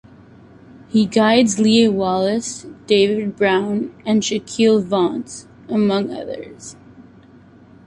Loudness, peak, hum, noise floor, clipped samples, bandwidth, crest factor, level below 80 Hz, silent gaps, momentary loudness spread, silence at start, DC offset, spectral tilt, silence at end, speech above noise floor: -17 LUFS; -2 dBFS; none; -46 dBFS; under 0.1%; 11 kHz; 16 dB; -56 dBFS; none; 17 LU; 0.75 s; under 0.1%; -4.5 dB/octave; 0.85 s; 29 dB